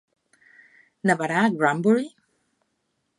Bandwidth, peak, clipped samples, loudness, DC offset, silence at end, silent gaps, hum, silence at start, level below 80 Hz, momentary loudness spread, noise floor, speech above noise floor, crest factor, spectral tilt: 11.5 kHz; -6 dBFS; under 0.1%; -22 LUFS; under 0.1%; 1.1 s; none; none; 1.05 s; -76 dBFS; 6 LU; -74 dBFS; 53 dB; 20 dB; -6 dB/octave